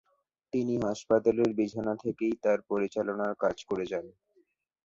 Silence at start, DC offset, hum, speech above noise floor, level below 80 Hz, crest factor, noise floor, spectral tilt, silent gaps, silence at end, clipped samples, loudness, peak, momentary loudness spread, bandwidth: 0.55 s; under 0.1%; none; 41 dB; -66 dBFS; 20 dB; -70 dBFS; -6.5 dB/octave; none; 0.75 s; under 0.1%; -30 LUFS; -12 dBFS; 7 LU; 7.8 kHz